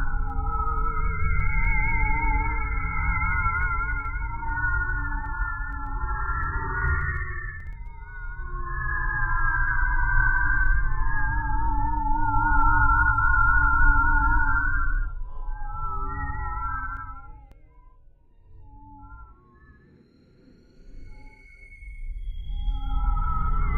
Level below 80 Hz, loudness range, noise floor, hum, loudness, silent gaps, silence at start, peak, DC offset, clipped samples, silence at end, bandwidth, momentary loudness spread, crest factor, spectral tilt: -26 dBFS; 14 LU; -56 dBFS; none; -26 LUFS; none; 0 s; -6 dBFS; under 0.1%; under 0.1%; 0 s; 3.5 kHz; 18 LU; 18 dB; -9 dB/octave